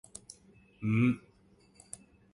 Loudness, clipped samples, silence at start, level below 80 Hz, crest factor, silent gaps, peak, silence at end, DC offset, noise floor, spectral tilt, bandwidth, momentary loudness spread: -31 LUFS; under 0.1%; 0.8 s; -68 dBFS; 20 dB; none; -16 dBFS; 1.15 s; under 0.1%; -64 dBFS; -7 dB/octave; 11.5 kHz; 23 LU